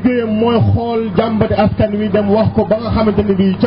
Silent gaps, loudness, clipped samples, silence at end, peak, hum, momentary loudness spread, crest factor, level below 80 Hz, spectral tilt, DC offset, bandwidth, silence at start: none; -14 LUFS; under 0.1%; 0 s; -4 dBFS; none; 3 LU; 10 dB; -32 dBFS; -12 dB/octave; 0.2%; 5.6 kHz; 0 s